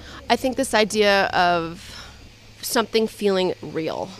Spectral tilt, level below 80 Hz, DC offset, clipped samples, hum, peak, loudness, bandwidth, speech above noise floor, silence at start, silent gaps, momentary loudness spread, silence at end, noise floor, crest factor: -3.5 dB/octave; -48 dBFS; under 0.1%; under 0.1%; none; -4 dBFS; -21 LUFS; 15.5 kHz; 24 dB; 0 s; none; 15 LU; 0 s; -45 dBFS; 18 dB